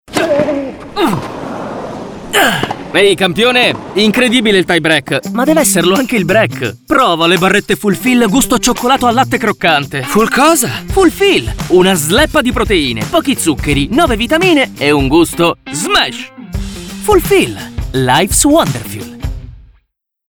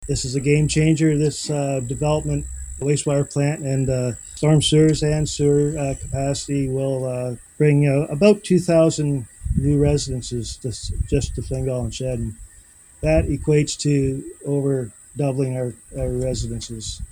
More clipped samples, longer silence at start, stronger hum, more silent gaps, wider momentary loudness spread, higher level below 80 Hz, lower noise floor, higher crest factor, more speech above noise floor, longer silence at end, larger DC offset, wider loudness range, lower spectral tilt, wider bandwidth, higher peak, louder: neither; about the same, 0.1 s vs 0 s; neither; neither; about the same, 13 LU vs 11 LU; about the same, -30 dBFS vs -34 dBFS; first, -61 dBFS vs -48 dBFS; second, 12 dB vs 20 dB; first, 50 dB vs 28 dB; first, 0.7 s vs 0 s; neither; about the same, 3 LU vs 5 LU; second, -4 dB/octave vs -6 dB/octave; first, over 20 kHz vs 12.5 kHz; about the same, 0 dBFS vs -2 dBFS; first, -11 LUFS vs -21 LUFS